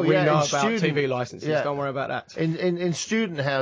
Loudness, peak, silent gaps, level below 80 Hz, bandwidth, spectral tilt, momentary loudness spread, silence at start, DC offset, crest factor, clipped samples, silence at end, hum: -24 LUFS; -8 dBFS; none; -66 dBFS; 8 kHz; -5 dB/octave; 7 LU; 0 s; under 0.1%; 16 dB; under 0.1%; 0 s; none